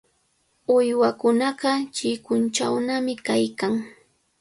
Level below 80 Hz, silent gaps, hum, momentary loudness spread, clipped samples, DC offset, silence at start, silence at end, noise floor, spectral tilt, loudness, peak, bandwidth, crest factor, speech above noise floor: -68 dBFS; none; none; 7 LU; under 0.1%; under 0.1%; 0.7 s; 0.5 s; -67 dBFS; -4 dB/octave; -23 LUFS; -8 dBFS; 11.5 kHz; 16 dB; 45 dB